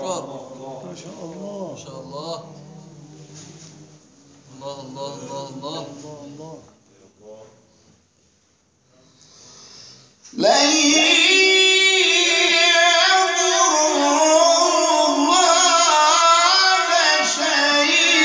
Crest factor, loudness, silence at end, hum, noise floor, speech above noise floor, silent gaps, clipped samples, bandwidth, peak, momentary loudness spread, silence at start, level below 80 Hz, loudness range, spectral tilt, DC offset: 16 dB; -14 LUFS; 0 s; none; -61 dBFS; 35 dB; none; under 0.1%; 10.5 kHz; -4 dBFS; 23 LU; 0 s; -72 dBFS; 23 LU; -0.5 dB/octave; under 0.1%